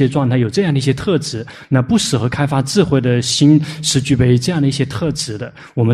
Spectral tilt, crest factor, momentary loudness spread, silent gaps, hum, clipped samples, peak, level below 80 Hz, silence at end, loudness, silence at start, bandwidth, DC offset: -5.5 dB/octave; 14 dB; 8 LU; none; none; under 0.1%; -2 dBFS; -42 dBFS; 0 s; -15 LUFS; 0 s; 13.5 kHz; under 0.1%